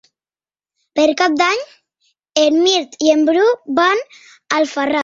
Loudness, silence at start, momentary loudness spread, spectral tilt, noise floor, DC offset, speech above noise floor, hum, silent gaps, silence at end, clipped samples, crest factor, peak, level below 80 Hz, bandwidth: -15 LUFS; 0.95 s; 9 LU; -1.5 dB/octave; under -90 dBFS; under 0.1%; over 75 dB; none; none; 0 s; under 0.1%; 16 dB; -2 dBFS; -64 dBFS; 7.8 kHz